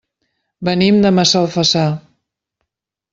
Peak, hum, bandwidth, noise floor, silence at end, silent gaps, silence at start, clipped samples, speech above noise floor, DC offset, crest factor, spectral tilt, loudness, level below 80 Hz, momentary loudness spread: -2 dBFS; none; 7.8 kHz; -79 dBFS; 1.15 s; none; 0.6 s; under 0.1%; 66 dB; under 0.1%; 14 dB; -5 dB/octave; -14 LUFS; -52 dBFS; 10 LU